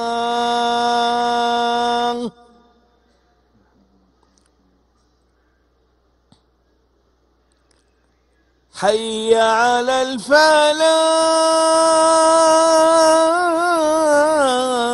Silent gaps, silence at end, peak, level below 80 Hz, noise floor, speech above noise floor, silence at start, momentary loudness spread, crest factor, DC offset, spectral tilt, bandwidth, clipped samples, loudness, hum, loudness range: none; 0 s; 0 dBFS; -58 dBFS; -60 dBFS; 46 dB; 0 s; 7 LU; 18 dB; under 0.1%; -1.5 dB/octave; 12 kHz; under 0.1%; -15 LUFS; 60 Hz at -65 dBFS; 13 LU